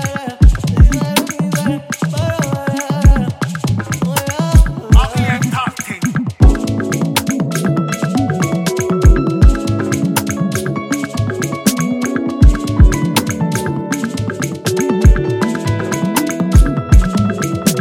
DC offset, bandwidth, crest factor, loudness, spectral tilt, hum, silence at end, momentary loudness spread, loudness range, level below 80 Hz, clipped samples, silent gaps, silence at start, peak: under 0.1%; 16.5 kHz; 14 dB; -15 LUFS; -5.5 dB/octave; none; 0 s; 7 LU; 2 LU; -16 dBFS; under 0.1%; none; 0 s; 0 dBFS